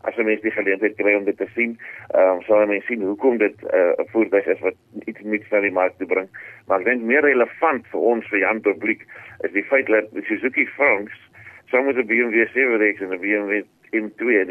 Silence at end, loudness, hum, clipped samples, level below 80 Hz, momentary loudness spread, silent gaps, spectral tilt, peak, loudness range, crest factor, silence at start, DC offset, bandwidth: 0 s; -20 LUFS; none; under 0.1%; -72 dBFS; 9 LU; none; -7.5 dB/octave; -6 dBFS; 2 LU; 16 dB; 0.05 s; under 0.1%; 3.6 kHz